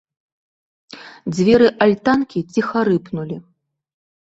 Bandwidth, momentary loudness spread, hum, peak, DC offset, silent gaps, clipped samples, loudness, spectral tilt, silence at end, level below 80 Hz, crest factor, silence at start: 8 kHz; 18 LU; none; -2 dBFS; under 0.1%; none; under 0.1%; -17 LUFS; -6.5 dB/octave; 0.8 s; -52 dBFS; 18 dB; 0.95 s